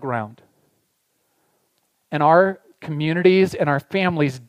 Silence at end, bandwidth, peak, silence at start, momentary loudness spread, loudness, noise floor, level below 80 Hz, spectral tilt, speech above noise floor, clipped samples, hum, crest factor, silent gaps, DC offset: 0.1 s; 14.5 kHz; -2 dBFS; 0 s; 15 LU; -19 LUFS; -69 dBFS; -60 dBFS; -7 dB/octave; 50 dB; under 0.1%; none; 20 dB; none; under 0.1%